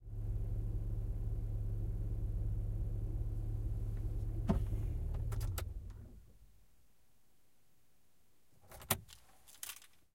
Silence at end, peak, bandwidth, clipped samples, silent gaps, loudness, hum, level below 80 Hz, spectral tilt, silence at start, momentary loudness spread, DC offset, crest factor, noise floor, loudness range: 0.35 s; -14 dBFS; 16.5 kHz; under 0.1%; none; -42 LUFS; none; -42 dBFS; -5.5 dB/octave; 0 s; 15 LU; under 0.1%; 26 dB; -76 dBFS; 8 LU